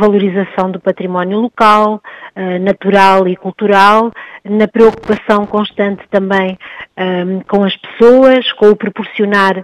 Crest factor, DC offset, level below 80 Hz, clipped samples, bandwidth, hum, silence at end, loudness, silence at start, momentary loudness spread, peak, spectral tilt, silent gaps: 10 dB; under 0.1%; -48 dBFS; 1%; 12 kHz; none; 0 s; -11 LUFS; 0 s; 12 LU; 0 dBFS; -6.5 dB/octave; none